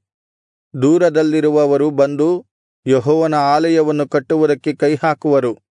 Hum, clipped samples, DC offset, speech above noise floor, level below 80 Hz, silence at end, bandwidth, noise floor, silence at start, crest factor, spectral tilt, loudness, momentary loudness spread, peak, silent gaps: none; under 0.1%; under 0.1%; over 76 dB; -68 dBFS; 0.25 s; 10.5 kHz; under -90 dBFS; 0.75 s; 12 dB; -7 dB/octave; -15 LUFS; 5 LU; -2 dBFS; 2.51-2.83 s